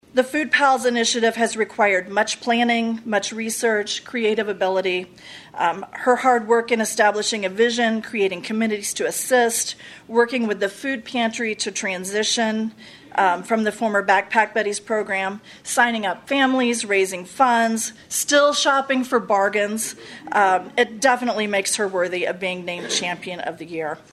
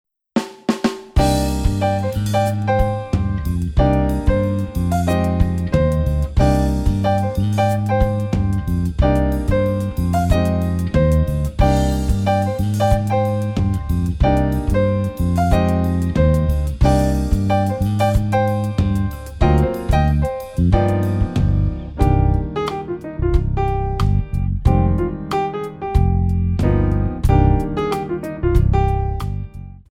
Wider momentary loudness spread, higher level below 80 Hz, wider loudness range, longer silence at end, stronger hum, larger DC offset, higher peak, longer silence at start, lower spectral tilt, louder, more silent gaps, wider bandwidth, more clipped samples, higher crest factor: first, 9 LU vs 6 LU; second, -66 dBFS vs -22 dBFS; about the same, 3 LU vs 2 LU; about the same, 0.15 s vs 0.1 s; neither; neither; about the same, -2 dBFS vs -2 dBFS; second, 0.15 s vs 0.35 s; second, -2.5 dB/octave vs -7.5 dB/octave; about the same, -20 LUFS vs -19 LUFS; neither; second, 14 kHz vs 15.5 kHz; neither; about the same, 18 dB vs 16 dB